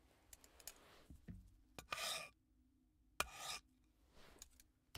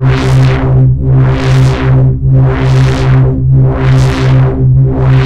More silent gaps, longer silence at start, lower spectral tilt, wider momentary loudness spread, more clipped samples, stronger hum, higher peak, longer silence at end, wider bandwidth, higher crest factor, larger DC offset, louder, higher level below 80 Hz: neither; about the same, 0.05 s vs 0 s; second, -1 dB/octave vs -8 dB/octave; first, 20 LU vs 0 LU; second, under 0.1% vs 0.1%; neither; second, -20 dBFS vs 0 dBFS; about the same, 0 s vs 0 s; first, 16 kHz vs 7.8 kHz; first, 34 dB vs 6 dB; neither; second, -49 LUFS vs -8 LUFS; second, -70 dBFS vs -18 dBFS